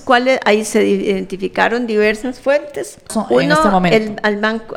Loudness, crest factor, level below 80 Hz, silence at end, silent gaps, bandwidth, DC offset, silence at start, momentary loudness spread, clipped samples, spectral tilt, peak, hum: -15 LUFS; 16 dB; -44 dBFS; 0 s; none; 16 kHz; under 0.1%; 0 s; 9 LU; under 0.1%; -5 dB/octave; 0 dBFS; none